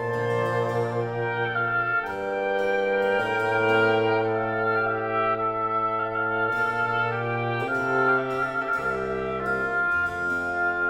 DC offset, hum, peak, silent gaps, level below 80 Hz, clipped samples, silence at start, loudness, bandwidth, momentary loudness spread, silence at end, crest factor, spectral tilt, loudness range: under 0.1%; none; -10 dBFS; none; -54 dBFS; under 0.1%; 0 s; -25 LUFS; 15.5 kHz; 5 LU; 0 s; 14 dB; -6.5 dB/octave; 2 LU